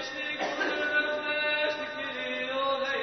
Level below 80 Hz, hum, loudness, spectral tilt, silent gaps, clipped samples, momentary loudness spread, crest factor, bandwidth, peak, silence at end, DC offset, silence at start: -72 dBFS; none; -29 LUFS; -2.5 dB/octave; none; under 0.1%; 6 LU; 16 dB; 6.4 kHz; -16 dBFS; 0 s; under 0.1%; 0 s